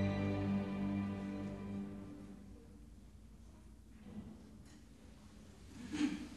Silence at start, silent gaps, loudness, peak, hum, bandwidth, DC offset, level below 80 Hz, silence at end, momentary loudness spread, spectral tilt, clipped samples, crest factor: 0 s; none; -42 LUFS; -26 dBFS; none; 12 kHz; under 0.1%; -60 dBFS; 0 s; 22 LU; -7 dB/octave; under 0.1%; 18 dB